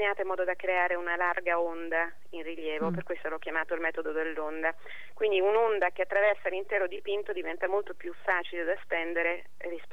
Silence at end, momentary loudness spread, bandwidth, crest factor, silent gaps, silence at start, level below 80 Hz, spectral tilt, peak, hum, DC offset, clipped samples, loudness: 0.05 s; 10 LU; 11.5 kHz; 18 dB; none; 0 s; -72 dBFS; -6 dB/octave; -14 dBFS; none; 1%; under 0.1%; -30 LUFS